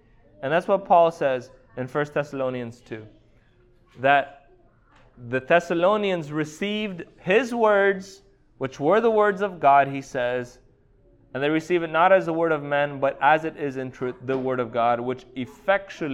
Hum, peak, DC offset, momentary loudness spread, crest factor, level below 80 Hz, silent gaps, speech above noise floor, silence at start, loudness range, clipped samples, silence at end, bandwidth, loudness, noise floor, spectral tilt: none; -4 dBFS; under 0.1%; 15 LU; 20 dB; -60 dBFS; none; 35 dB; 0.4 s; 6 LU; under 0.1%; 0 s; 12 kHz; -23 LUFS; -58 dBFS; -6 dB/octave